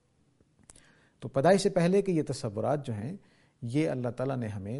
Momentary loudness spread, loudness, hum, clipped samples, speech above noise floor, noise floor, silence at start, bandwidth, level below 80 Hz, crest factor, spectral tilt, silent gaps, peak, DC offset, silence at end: 16 LU; -29 LUFS; none; under 0.1%; 39 dB; -67 dBFS; 1.2 s; 11.5 kHz; -64 dBFS; 20 dB; -6.5 dB/octave; none; -10 dBFS; under 0.1%; 0 s